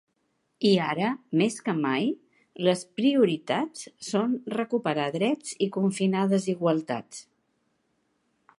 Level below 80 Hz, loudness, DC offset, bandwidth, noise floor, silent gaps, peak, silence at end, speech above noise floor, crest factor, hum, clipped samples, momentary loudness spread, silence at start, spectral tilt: -78 dBFS; -26 LUFS; under 0.1%; 11.5 kHz; -74 dBFS; none; -8 dBFS; 1.35 s; 48 dB; 18 dB; none; under 0.1%; 8 LU; 0.6 s; -5.5 dB/octave